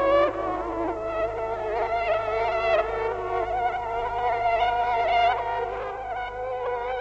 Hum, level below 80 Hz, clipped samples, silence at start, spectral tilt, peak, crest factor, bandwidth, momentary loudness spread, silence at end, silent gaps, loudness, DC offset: none; -46 dBFS; under 0.1%; 0 s; -5.5 dB/octave; -8 dBFS; 16 dB; 8 kHz; 8 LU; 0 s; none; -26 LUFS; under 0.1%